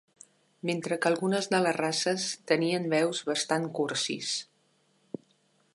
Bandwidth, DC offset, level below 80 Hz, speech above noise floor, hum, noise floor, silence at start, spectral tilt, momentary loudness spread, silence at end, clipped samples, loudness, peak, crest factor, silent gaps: 11.5 kHz; under 0.1%; -80 dBFS; 40 dB; none; -69 dBFS; 0.65 s; -3.5 dB/octave; 9 LU; 1.3 s; under 0.1%; -29 LUFS; -10 dBFS; 22 dB; none